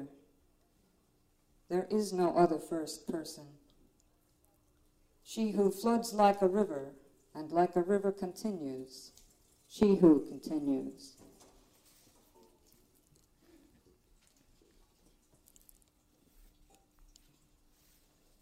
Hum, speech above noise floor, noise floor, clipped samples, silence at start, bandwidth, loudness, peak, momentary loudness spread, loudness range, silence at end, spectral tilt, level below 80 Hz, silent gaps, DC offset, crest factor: none; 40 dB; -71 dBFS; under 0.1%; 0 s; 16 kHz; -32 LUFS; -10 dBFS; 23 LU; 7 LU; 7.35 s; -6.5 dB/octave; -68 dBFS; none; under 0.1%; 24 dB